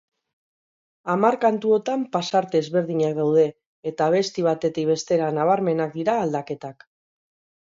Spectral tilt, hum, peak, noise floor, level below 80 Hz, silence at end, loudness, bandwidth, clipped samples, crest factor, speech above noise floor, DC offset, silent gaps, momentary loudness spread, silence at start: -6 dB/octave; none; -4 dBFS; under -90 dBFS; -68 dBFS; 0.95 s; -22 LUFS; 7.6 kHz; under 0.1%; 18 dB; over 68 dB; under 0.1%; 3.66-3.83 s; 10 LU; 1.05 s